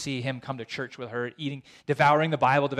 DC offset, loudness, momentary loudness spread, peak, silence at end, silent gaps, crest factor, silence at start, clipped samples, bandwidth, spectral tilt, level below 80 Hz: under 0.1%; -27 LUFS; 14 LU; -10 dBFS; 0 s; none; 16 dB; 0 s; under 0.1%; 12.5 kHz; -6 dB/octave; -66 dBFS